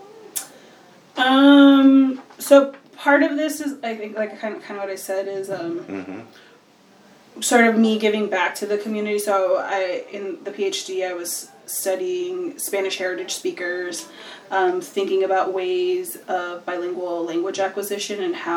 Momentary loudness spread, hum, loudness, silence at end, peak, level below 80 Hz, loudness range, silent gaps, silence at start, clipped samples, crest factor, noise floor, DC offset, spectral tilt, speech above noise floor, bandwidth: 15 LU; none; -21 LUFS; 0 s; -2 dBFS; -82 dBFS; 10 LU; none; 0 s; under 0.1%; 20 dB; -52 dBFS; under 0.1%; -3.5 dB/octave; 31 dB; 19 kHz